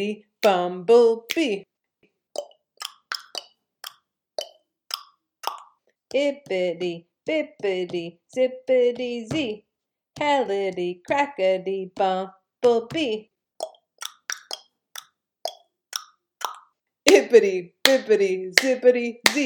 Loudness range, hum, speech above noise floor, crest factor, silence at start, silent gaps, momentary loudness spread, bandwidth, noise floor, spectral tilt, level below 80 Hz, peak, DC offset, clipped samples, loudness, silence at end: 15 LU; none; 46 dB; 24 dB; 0 s; none; 19 LU; 19 kHz; -68 dBFS; -3 dB/octave; -68 dBFS; 0 dBFS; under 0.1%; under 0.1%; -23 LUFS; 0 s